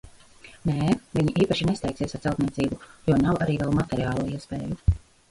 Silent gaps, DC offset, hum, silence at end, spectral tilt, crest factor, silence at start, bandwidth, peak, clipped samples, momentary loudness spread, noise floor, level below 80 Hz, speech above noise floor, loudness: none; under 0.1%; none; 0.35 s; -7 dB/octave; 18 dB; 0.05 s; 11.5 kHz; -8 dBFS; under 0.1%; 8 LU; -50 dBFS; -38 dBFS; 25 dB; -26 LUFS